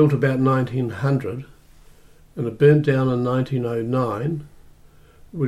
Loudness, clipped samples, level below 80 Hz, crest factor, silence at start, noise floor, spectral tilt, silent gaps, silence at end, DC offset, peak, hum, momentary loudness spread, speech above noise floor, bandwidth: -21 LUFS; under 0.1%; -52 dBFS; 16 dB; 0 s; -49 dBFS; -9 dB/octave; none; 0 s; under 0.1%; -4 dBFS; none; 16 LU; 29 dB; 11.5 kHz